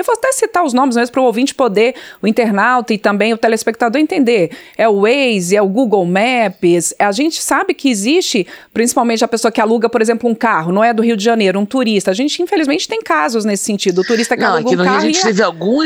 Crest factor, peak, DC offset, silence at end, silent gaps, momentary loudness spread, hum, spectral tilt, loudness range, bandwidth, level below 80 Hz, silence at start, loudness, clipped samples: 12 dB; 0 dBFS; under 0.1%; 0 s; none; 3 LU; none; -4 dB/octave; 1 LU; over 20 kHz; -60 dBFS; 0 s; -13 LUFS; under 0.1%